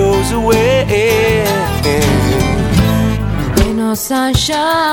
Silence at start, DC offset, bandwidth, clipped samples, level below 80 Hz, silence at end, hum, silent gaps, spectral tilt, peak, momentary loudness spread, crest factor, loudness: 0 s; under 0.1%; 19.5 kHz; under 0.1%; -24 dBFS; 0 s; none; none; -5 dB/octave; 0 dBFS; 4 LU; 12 dB; -13 LUFS